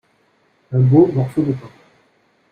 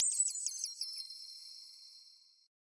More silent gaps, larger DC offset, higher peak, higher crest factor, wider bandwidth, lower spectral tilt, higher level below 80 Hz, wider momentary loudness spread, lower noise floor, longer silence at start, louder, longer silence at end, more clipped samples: neither; neither; first, -2 dBFS vs -18 dBFS; second, 16 dB vs 24 dB; second, 4.6 kHz vs 11.5 kHz; first, -11 dB/octave vs 9 dB/octave; first, -54 dBFS vs under -90 dBFS; second, 11 LU vs 21 LU; about the same, -60 dBFS vs -62 dBFS; first, 0.7 s vs 0 s; first, -16 LUFS vs -37 LUFS; first, 0.85 s vs 0.55 s; neither